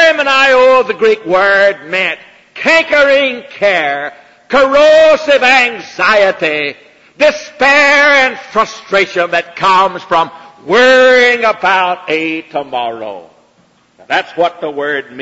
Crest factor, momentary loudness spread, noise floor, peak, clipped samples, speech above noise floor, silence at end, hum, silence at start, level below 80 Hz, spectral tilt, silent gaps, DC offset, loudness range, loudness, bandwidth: 10 dB; 12 LU; -51 dBFS; 0 dBFS; under 0.1%; 40 dB; 0 s; none; 0 s; -52 dBFS; -3 dB/octave; none; under 0.1%; 3 LU; -10 LUFS; 8 kHz